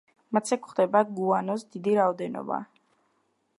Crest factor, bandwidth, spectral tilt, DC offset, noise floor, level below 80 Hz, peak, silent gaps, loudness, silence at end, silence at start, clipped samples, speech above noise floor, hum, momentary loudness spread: 20 dB; 11.5 kHz; -6 dB/octave; under 0.1%; -72 dBFS; -80 dBFS; -8 dBFS; none; -27 LUFS; 0.95 s; 0.3 s; under 0.1%; 46 dB; none; 10 LU